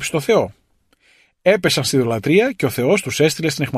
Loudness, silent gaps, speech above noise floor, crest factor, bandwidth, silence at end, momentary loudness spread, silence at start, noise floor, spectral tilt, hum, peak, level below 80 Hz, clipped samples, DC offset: -17 LUFS; none; 43 dB; 16 dB; 15 kHz; 0 s; 4 LU; 0 s; -60 dBFS; -4.5 dB/octave; none; -2 dBFS; -54 dBFS; under 0.1%; under 0.1%